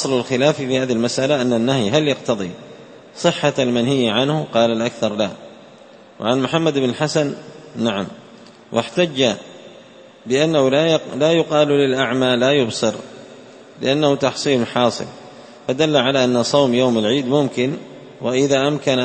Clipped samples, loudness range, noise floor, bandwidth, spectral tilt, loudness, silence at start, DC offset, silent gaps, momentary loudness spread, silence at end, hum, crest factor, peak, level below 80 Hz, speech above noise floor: under 0.1%; 4 LU; -44 dBFS; 8.8 kHz; -5 dB/octave; -18 LUFS; 0 s; under 0.1%; none; 12 LU; 0 s; none; 18 dB; 0 dBFS; -58 dBFS; 26 dB